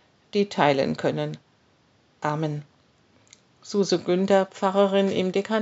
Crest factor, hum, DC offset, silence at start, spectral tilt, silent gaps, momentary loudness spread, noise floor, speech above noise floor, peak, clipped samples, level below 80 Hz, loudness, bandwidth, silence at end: 22 dB; none; under 0.1%; 0.35 s; -5 dB/octave; none; 10 LU; -62 dBFS; 39 dB; -4 dBFS; under 0.1%; -70 dBFS; -24 LUFS; 8 kHz; 0 s